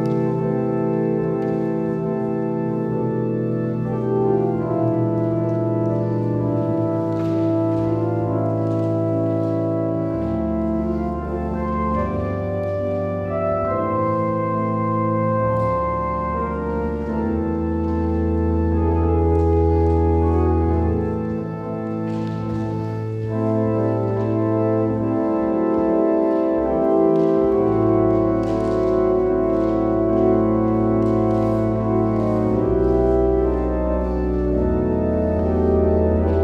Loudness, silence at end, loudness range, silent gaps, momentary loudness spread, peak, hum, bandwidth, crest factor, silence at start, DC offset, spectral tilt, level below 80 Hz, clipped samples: -20 LUFS; 0 s; 4 LU; none; 6 LU; -6 dBFS; none; 6 kHz; 14 dB; 0 s; under 0.1%; -10.5 dB/octave; -32 dBFS; under 0.1%